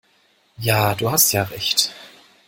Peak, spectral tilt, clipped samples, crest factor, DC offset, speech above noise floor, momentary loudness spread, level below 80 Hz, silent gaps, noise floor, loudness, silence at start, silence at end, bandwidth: -2 dBFS; -2.5 dB/octave; under 0.1%; 20 dB; under 0.1%; 41 dB; 7 LU; -54 dBFS; none; -60 dBFS; -18 LUFS; 0.6 s; 0.4 s; 17 kHz